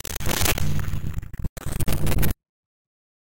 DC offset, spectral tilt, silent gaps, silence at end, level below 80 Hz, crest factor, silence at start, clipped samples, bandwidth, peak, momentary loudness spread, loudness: 5%; -4 dB/octave; 1.49-1.56 s, 2.49-2.85 s; 0.4 s; -32 dBFS; 18 dB; 0 s; under 0.1%; 17.5 kHz; -6 dBFS; 17 LU; -26 LUFS